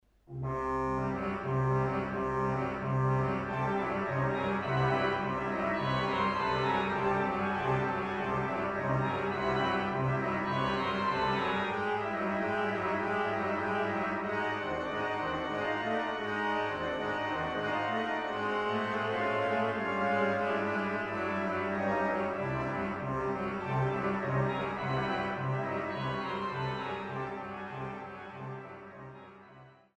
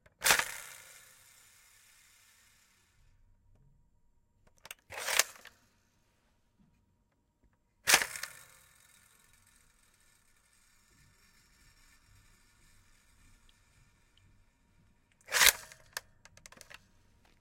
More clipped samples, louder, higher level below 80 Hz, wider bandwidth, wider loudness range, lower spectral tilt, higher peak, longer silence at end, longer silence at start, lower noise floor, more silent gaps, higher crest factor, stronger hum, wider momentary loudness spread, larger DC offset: neither; second, -32 LUFS vs -29 LUFS; first, -56 dBFS vs -66 dBFS; second, 9.2 kHz vs 16.5 kHz; second, 3 LU vs 6 LU; first, -7 dB/octave vs 1.5 dB/octave; second, -16 dBFS vs -6 dBFS; second, 0.25 s vs 1.4 s; about the same, 0.3 s vs 0.2 s; second, -56 dBFS vs -75 dBFS; neither; second, 16 dB vs 34 dB; neither; second, 5 LU vs 30 LU; neither